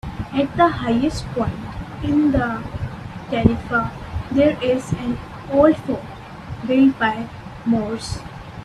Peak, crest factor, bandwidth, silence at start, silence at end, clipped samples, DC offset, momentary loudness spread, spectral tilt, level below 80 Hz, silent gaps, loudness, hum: 0 dBFS; 20 dB; 12 kHz; 0.05 s; 0 s; under 0.1%; under 0.1%; 15 LU; -7 dB/octave; -38 dBFS; none; -20 LUFS; none